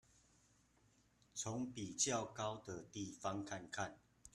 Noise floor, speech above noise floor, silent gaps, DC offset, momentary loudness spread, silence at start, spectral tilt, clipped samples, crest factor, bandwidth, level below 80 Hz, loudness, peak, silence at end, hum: -74 dBFS; 30 dB; none; under 0.1%; 12 LU; 1.35 s; -3 dB/octave; under 0.1%; 24 dB; 13 kHz; -76 dBFS; -44 LUFS; -24 dBFS; 0.05 s; none